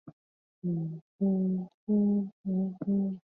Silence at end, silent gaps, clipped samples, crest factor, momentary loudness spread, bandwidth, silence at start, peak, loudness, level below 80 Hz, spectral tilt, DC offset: 0.05 s; 0.13-0.62 s, 1.01-1.19 s, 1.74-1.87 s, 2.32-2.44 s; under 0.1%; 12 dB; 8 LU; 1.5 kHz; 0.05 s; -18 dBFS; -31 LUFS; -72 dBFS; -14 dB/octave; under 0.1%